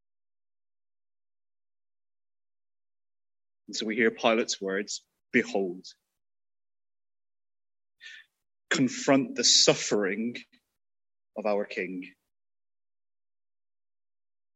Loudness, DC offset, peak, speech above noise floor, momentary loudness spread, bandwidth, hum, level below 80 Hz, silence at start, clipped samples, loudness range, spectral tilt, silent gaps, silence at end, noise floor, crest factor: -26 LUFS; under 0.1%; -6 dBFS; over 63 dB; 23 LU; 8.6 kHz; none; -80 dBFS; 3.7 s; under 0.1%; 12 LU; -2.5 dB/octave; none; 2.45 s; under -90 dBFS; 26 dB